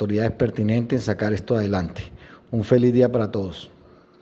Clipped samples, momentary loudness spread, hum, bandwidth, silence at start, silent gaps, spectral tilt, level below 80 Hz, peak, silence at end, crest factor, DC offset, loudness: under 0.1%; 15 LU; none; 7.8 kHz; 0 s; none; -8 dB/octave; -48 dBFS; -4 dBFS; 0.55 s; 18 dB; under 0.1%; -22 LUFS